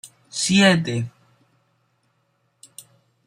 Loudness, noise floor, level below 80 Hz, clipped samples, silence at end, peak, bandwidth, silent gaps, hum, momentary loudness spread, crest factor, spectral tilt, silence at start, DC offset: -19 LUFS; -68 dBFS; -62 dBFS; under 0.1%; 2.15 s; -2 dBFS; 15 kHz; none; none; 26 LU; 22 dB; -4 dB/octave; 0.05 s; under 0.1%